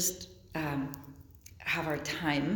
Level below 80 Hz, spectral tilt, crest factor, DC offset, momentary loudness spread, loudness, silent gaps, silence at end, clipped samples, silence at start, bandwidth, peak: -58 dBFS; -3.5 dB/octave; 18 dB; under 0.1%; 20 LU; -34 LUFS; none; 0 s; under 0.1%; 0 s; 19 kHz; -16 dBFS